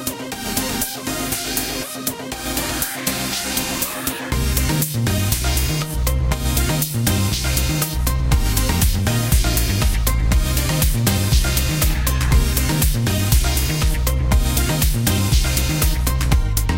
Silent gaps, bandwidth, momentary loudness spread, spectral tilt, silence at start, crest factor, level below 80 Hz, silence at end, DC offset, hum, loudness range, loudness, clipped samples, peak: none; 17.5 kHz; 5 LU; -4 dB/octave; 0 s; 16 dB; -22 dBFS; 0 s; under 0.1%; none; 4 LU; -19 LUFS; under 0.1%; -2 dBFS